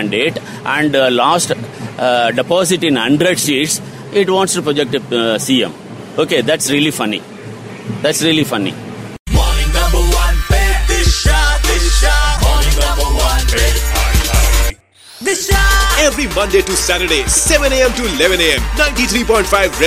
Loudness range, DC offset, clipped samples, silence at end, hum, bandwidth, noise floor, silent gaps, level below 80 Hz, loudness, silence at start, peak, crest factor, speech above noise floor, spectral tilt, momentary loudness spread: 4 LU; under 0.1%; under 0.1%; 0 s; none; 16 kHz; -39 dBFS; 9.19-9.26 s; -18 dBFS; -13 LUFS; 0 s; 0 dBFS; 14 dB; 25 dB; -3.5 dB/octave; 8 LU